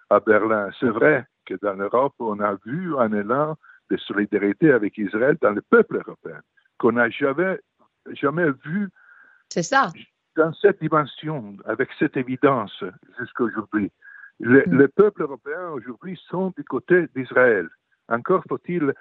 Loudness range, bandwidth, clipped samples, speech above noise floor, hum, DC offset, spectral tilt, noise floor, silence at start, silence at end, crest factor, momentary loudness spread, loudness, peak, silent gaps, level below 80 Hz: 4 LU; 7.8 kHz; under 0.1%; 31 dB; none; under 0.1%; -6.5 dB/octave; -52 dBFS; 0.1 s; 0.05 s; 20 dB; 14 LU; -22 LUFS; -2 dBFS; none; -68 dBFS